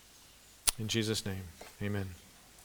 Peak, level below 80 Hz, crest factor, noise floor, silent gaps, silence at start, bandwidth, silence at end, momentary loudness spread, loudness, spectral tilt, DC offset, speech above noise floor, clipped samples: -2 dBFS; -56 dBFS; 36 dB; -58 dBFS; none; 0.05 s; over 20 kHz; 0 s; 24 LU; -35 LUFS; -3.5 dB/octave; under 0.1%; 22 dB; under 0.1%